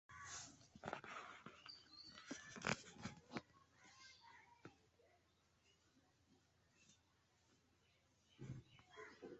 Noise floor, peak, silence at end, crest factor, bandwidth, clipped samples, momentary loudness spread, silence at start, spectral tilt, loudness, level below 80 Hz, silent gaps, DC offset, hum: -79 dBFS; -22 dBFS; 0 s; 34 dB; 8 kHz; under 0.1%; 18 LU; 0.1 s; -3 dB/octave; -54 LUFS; -80 dBFS; none; under 0.1%; none